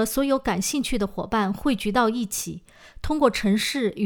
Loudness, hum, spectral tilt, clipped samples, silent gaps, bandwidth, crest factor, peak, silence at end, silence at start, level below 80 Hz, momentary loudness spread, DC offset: -24 LUFS; none; -4 dB/octave; under 0.1%; none; over 20 kHz; 20 dB; -4 dBFS; 0 s; 0 s; -42 dBFS; 8 LU; under 0.1%